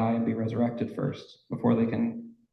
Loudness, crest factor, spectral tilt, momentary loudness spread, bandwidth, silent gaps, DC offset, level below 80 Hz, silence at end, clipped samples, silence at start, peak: -29 LUFS; 16 dB; -9.5 dB/octave; 13 LU; 6 kHz; none; under 0.1%; -62 dBFS; 0.2 s; under 0.1%; 0 s; -14 dBFS